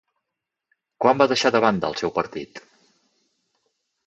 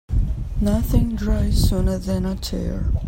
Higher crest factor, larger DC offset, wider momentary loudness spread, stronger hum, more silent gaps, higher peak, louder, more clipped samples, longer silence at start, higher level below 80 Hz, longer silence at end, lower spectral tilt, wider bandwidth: first, 22 dB vs 14 dB; neither; first, 14 LU vs 6 LU; neither; neither; about the same, -2 dBFS vs -4 dBFS; about the same, -21 LUFS vs -22 LUFS; neither; first, 1 s vs 0.1 s; second, -62 dBFS vs -22 dBFS; first, 1.45 s vs 0 s; second, -4.5 dB/octave vs -7 dB/octave; second, 8.4 kHz vs 16.5 kHz